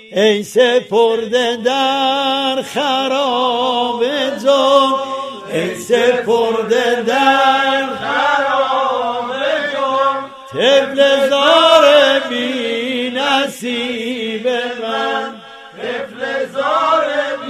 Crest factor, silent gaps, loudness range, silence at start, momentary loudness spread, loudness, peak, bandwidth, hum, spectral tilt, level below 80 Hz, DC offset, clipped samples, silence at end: 14 dB; none; 6 LU; 0.05 s; 10 LU; -14 LUFS; 0 dBFS; 15 kHz; none; -3 dB/octave; -64 dBFS; under 0.1%; under 0.1%; 0 s